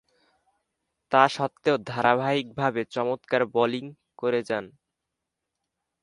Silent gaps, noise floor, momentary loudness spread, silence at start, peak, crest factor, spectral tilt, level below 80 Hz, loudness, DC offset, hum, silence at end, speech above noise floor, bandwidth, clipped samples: none; -84 dBFS; 10 LU; 1.1 s; -4 dBFS; 24 dB; -5.5 dB/octave; -70 dBFS; -25 LUFS; under 0.1%; none; 1.35 s; 59 dB; 11 kHz; under 0.1%